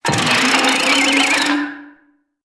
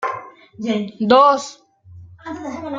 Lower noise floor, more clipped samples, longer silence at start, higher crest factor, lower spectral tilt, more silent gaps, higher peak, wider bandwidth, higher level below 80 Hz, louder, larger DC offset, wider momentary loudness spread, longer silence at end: first, -57 dBFS vs -42 dBFS; neither; about the same, 0.05 s vs 0 s; about the same, 16 dB vs 18 dB; second, -2 dB/octave vs -5 dB/octave; neither; about the same, -2 dBFS vs -2 dBFS; first, 11 kHz vs 7.8 kHz; first, -56 dBFS vs -62 dBFS; first, -13 LUFS vs -17 LUFS; neither; second, 7 LU vs 21 LU; first, 0.55 s vs 0 s